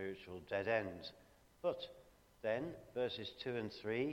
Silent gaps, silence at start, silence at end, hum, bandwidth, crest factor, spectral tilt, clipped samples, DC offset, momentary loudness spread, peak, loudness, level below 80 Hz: none; 0 s; 0 s; none; 16.5 kHz; 20 dB; -6 dB/octave; under 0.1%; under 0.1%; 12 LU; -22 dBFS; -43 LUFS; -72 dBFS